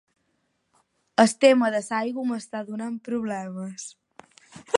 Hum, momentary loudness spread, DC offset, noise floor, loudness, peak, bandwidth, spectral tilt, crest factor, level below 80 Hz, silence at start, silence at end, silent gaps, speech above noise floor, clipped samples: none; 17 LU; under 0.1%; -73 dBFS; -24 LUFS; -4 dBFS; 11.5 kHz; -4 dB/octave; 22 dB; -74 dBFS; 1.2 s; 0 s; none; 49 dB; under 0.1%